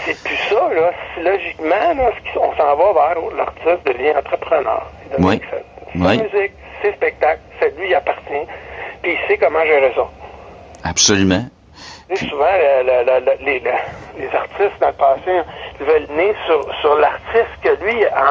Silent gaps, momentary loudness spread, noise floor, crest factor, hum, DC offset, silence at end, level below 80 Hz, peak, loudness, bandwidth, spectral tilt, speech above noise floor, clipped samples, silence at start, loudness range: none; 11 LU; -38 dBFS; 16 dB; none; under 0.1%; 0 s; -44 dBFS; 0 dBFS; -16 LUFS; 10 kHz; -3.5 dB/octave; 22 dB; under 0.1%; 0 s; 2 LU